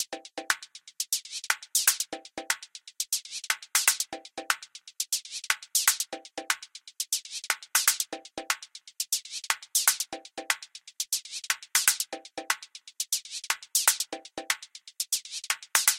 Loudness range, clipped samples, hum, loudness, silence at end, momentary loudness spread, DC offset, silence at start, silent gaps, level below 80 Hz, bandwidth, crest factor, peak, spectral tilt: 2 LU; under 0.1%; none; -28 LUFS; 0 s; 14 LU; under 0.1%; 0 s; none; -74 dBFS; 17 kHz; 30 dB; -2 dBFS; 2.5 dB/octave